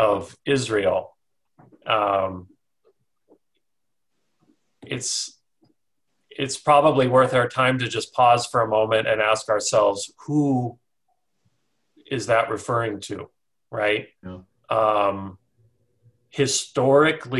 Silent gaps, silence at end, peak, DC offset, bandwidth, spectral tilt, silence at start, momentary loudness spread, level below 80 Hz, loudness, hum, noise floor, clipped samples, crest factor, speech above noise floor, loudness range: none; 0 s; -4 dBFS; under 0.1%; 12.5 kHz; -4 dB/octave; 0 s; 17 LU; -58 dBFS; -21 LUFS; none; -84 dBFS; under 0.1%; 20 dB; 63 dB; 12 LU